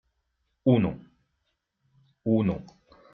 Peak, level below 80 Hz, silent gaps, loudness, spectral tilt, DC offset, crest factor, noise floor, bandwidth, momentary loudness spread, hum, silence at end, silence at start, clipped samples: -8 dBFS; -58 dBFS; none; -27 LUFS; -8.5 dB/octave; under 0.1%; 22 dB; -78 dBFS; 6 kHz; 13 LU; none; 0.5 s; 0.65 s; under 0.1%